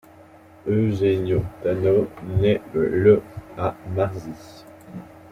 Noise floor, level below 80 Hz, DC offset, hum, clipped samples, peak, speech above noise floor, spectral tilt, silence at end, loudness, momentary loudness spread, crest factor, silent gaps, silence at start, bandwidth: -48 dBFS; -48 dBFS; under 0.1%; none; under 0.1%; -4 dBFS; 27 dB; -8.5 dB/octave; 0.25 s; -22 LUFS; 21 LU; 18 dB; none; 0.65 s; 11.5 kHz